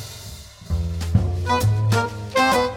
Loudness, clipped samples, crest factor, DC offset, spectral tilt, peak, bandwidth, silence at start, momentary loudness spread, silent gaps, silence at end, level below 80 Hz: -21 LUFS; under 0.1%; 18 dB; under 0.1%; -5.5 dB/octave; -4 dBFS; 17 kHz; 0 s; 17 LU; none; 0 s; -32 dBFS